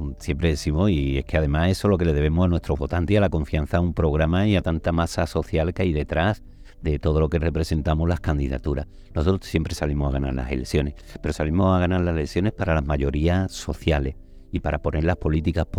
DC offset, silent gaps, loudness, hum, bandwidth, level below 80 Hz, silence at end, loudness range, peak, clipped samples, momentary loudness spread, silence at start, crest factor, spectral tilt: under 0.1%; none; -23 LUFS; none; 13 kHz; -30 dBFS; 0 s; 3 LU; -4 dBFS; under 0.1%; 7 LU; 0 s; 18 dB; -7 dB/octave